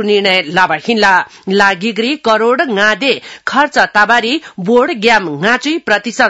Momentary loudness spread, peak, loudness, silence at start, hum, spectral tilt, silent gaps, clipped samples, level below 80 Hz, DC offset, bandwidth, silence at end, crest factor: 5 LU; 0 dBFS; -12 LUFS; 0 s; none; -4 dB/octave; none; 0.3%; -52 dBFS; 0.2%; 12 kHz; 0 s; 12 dB